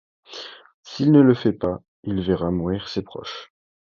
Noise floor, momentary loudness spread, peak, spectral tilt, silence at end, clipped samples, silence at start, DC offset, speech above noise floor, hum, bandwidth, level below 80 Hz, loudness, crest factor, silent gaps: -40 dBFS; 22 LU; -2 dBFS; -8 dB/octave; 0.55 s; under 0.1%; 0.3 s; under 0.1%; 20 dB; none; 7 kHz; -48 dBFS; -21 LUFS; 20 dB; 0.74-0.83 s, 1.88-2.03 s